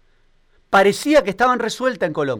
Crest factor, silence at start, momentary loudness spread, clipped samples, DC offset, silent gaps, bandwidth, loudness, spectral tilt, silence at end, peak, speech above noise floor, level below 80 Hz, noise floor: 14 dB; 0.7 s; 6 LU; under 0.1%; under 0.1%; none; 17.5 kHz; -17 LUFS; -4.5 dB/octave; 0 s; -6 dBFS; 39 dB; -50 dBFS; -56 dBFS